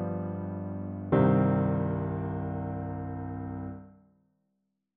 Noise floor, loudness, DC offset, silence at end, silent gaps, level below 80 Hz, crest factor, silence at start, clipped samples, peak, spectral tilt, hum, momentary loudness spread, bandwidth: -80 dBFS; -30 LUFS; under 0.1%; 1.05 s; none; -54 dBFS; 18 dB; 0 s; under 0.1%; -12 dBFS; -10 dB/octave; 50 Hz at -65 dBFS; 14 LU; 3.7 kHz